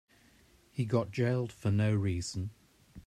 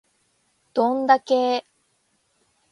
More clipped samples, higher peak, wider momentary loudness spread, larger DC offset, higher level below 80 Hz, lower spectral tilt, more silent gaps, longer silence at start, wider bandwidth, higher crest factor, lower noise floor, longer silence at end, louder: neither; second, -16 dBFS vs -4 dBFS; about the same, 11 LU vs 9 LU; neither; first, -62 dBFS vs -76 dBFS; first, -7 dB/octave vs -4 dB/octave; neither; about the same, 0.75 s vs 0.75 s; about the same, 11 kHz vs 11 kHz; about the same, 16 dB vs 20 dB; second, -63 dBFS vs -68 dBFS; second, 0.05 s vs 1.1 s; second, -32 LUFS vs -21 LUFS